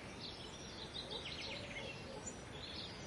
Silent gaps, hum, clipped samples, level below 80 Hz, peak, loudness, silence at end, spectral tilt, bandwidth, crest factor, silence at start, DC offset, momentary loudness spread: none; none; under 0.1%; -62 dBFS; -34 dBFS; -47 LUFS; 0 s; -3 dB/octave; 11.5 kHz; 14 dB; 0 s; under 0.1%; 4 LU